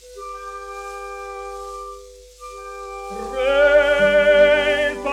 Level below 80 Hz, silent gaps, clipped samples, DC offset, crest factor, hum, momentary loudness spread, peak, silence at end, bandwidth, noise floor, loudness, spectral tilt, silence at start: -44 dBFS; none; under 0.1%; under 0.1%; 16 dB; none; 21 LU; -4 dBFS; 0 s; 12 kHz; -41 dBFS; -16 LUFS; -3.5 dB/octave; 0.05 s